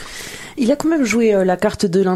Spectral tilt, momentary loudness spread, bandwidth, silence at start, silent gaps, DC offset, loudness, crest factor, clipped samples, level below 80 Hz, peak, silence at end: -5.5 dB/octave; 15 LU; 15 kHz; 0 s; none; under 0.1%; -16 LUFS; 14 dB; under 0.1%; -46 dBFS; -2 dBFS; 0 s